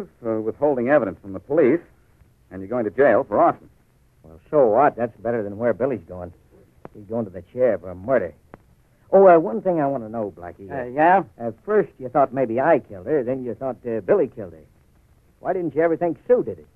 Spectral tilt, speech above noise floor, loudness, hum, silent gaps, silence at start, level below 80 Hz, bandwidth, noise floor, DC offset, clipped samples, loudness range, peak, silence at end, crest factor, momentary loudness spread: -10 dB/octave; 36 dB; -21 LUFS; none; none; 0 s; -58 dBFS; 3.9 kHz; -57 dBFS; under 0.1%; under 0.1%; 5 LU; -4 dBFS; 0.2 s; 18 dB; 14 LU